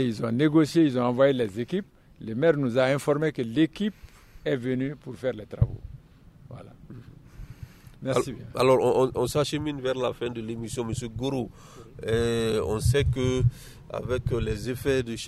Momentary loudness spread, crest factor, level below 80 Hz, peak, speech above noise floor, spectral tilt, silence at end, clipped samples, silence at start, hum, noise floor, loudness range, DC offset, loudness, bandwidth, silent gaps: 23 LU; 18 dB; -44 dBFS; -8 dBFS; 26 dB; -6.5 dB/octave; 0 s; under 0.1%; 0 s; none; -51 dBFS; 8 LU; under 0.1%; -26 LUFS; 14.5 kHz; none